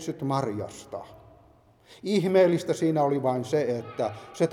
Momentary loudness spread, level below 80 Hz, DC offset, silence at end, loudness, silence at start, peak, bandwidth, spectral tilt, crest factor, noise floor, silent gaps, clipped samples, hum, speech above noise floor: 16 LU; -66 dBFS; under 0.1%; 0 s; -26 LUFS; 0 s; -10 dBFS; 14.5 kHz; -6.5 dB/octave; 18 dB; -58 dBFS; none; under 0.1%; none; 32 dB